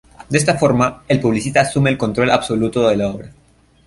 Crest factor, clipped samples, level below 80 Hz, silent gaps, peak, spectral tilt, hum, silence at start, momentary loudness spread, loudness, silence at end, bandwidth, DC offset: 16 dB; under 0.1%; -44 dBFS; none; -2 dBFS; -5.5 dB/octave; none; 0.2 s; 5 LU; -16 LUFS; 0.55 s; 11.5 kHz; under 0.1%